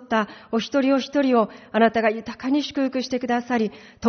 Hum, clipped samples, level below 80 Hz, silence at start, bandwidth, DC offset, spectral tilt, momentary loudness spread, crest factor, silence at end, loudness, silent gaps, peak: none; under 0.1%; -60 dBFS; 0 s; 6.6 kHz; under 0.1%; -3.5 dB/octave; 7 LU; 16 dB; 0 s; -23 LUFS; none; -6 dBFS